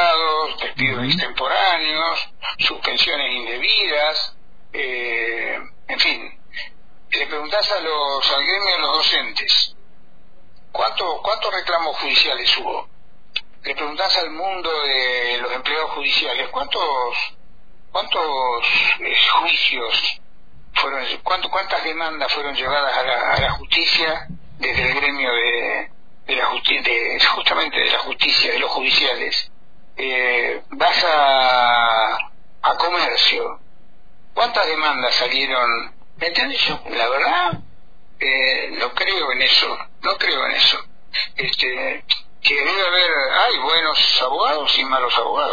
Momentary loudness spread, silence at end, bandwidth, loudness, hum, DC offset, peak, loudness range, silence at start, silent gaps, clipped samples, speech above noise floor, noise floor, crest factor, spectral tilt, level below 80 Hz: 10 LU; 0 s; 5 kHz; -18 LUFS; none; 3%; -2 dBFS; 4 LU; 0 s; none; under 0.1%; 34 dB; -53 dBFS; 18 dB; -2.5 dB/octave; -48 dBFS